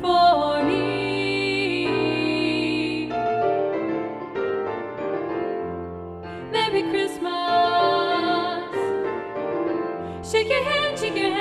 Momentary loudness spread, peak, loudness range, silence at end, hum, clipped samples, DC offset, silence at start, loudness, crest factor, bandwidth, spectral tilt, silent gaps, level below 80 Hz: 9 LU; -8 dBFS; 4 LU; 0 s; none; under 0.1%; under 0.1%; 0 s; -23 LUFS; 16 dB; 13 kHz; -5 dB/octave; none; -54 dBFS